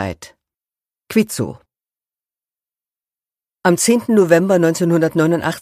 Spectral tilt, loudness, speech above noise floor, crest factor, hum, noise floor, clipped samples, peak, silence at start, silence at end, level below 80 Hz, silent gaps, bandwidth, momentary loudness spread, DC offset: -5.5 dB/octave; -15 LUFS; over 75 dB; 18 dB; none; under -90 dBFS; under 0.1%; 0 dBFS; 0 s; 0 s; -56 dBFS; none; 15.5 kHz; 12 LU; under 0.1%